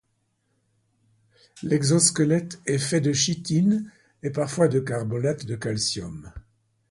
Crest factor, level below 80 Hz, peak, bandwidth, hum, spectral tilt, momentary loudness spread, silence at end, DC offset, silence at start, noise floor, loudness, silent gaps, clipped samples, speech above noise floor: 20 dB; -56 dBFS; -6 dBFS; 11.5 kHz; none; -4.5 dB/octave; 14 LU; 0.5 s; under 0.1%; 1.55 s; -72 dBFS; -24 LUFS; none; under 0.1%; 48 dB